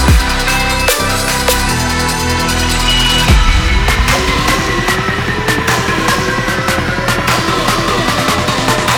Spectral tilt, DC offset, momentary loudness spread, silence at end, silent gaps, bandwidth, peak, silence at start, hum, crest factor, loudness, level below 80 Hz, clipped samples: -3.5 dB/octave; under 0.1%; 4 LU; 0 s; none; 19 kHz; 0 dBFS; 0 s; none; 12 dB; -12 LUFS; -18 dBFS; under 0.1%